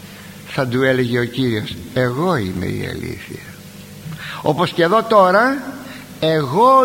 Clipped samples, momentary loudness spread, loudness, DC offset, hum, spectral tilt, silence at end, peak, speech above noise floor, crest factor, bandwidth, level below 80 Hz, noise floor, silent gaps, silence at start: under 0.1%; 21 LU; -17 LUFS; under 0.1%; none; -6 dB/octave; 0 s; 0 dBFS; 20 dB; 18 dB; 16.5 kHz; -48 dBFS; -37 dBFS; none; 0 s